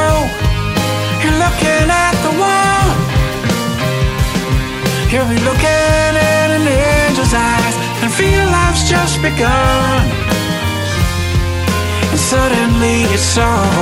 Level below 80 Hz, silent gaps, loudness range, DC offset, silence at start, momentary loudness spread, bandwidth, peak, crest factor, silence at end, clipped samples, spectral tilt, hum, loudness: -22 dBFS; none; 2 LU; under 0.1%; 0 s; 5 LU; 16.5 kHz; -2 dBFS; 12 dB; 0 s; under 0.1%; -4.5 dB/octave; none; -13 LUFS